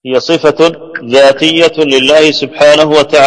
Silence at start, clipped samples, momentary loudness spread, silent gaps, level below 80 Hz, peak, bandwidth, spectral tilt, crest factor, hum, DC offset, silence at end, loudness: 0.05 s; 2%; 5 LU; none; -46 dBFS; 0 dBFS; 11 kHz; -3.5 dB/octave; 8 dB; none; under 0.1%; 0 s; -7 LUFS